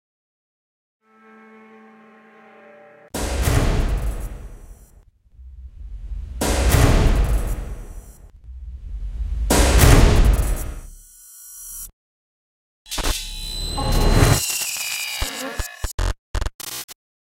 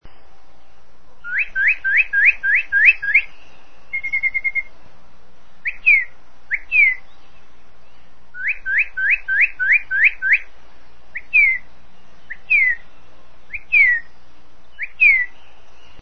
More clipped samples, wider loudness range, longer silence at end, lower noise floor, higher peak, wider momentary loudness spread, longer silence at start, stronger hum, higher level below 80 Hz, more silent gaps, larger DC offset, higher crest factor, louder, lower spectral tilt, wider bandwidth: neither; first, 8 LU vs 3 LU; second, 0.4 s vs 0.75 s; about the same, -51 dBFS vs -52 dBFS; about the same, 0 dBFS vs 0 dBFS; first, 23 LU vs 18 LU; first, 3.15 s vs 0 s; neither; first, -24 dBFS vs -48 dBFS; first, 11.93-12.85 s, 15.94-15.98 s, 16.18-16.34 s, 16.54-16.59 s, 16.84-16.88 s vs none; second, under 0.1% vs 4%; about the same, 22 dB vs 20 dB; second, -21 LUFS vs -15 LUFS; first, -4.5 dB/octave vs -2 dB/octave; first, 17 kHz vs 6.4 kHz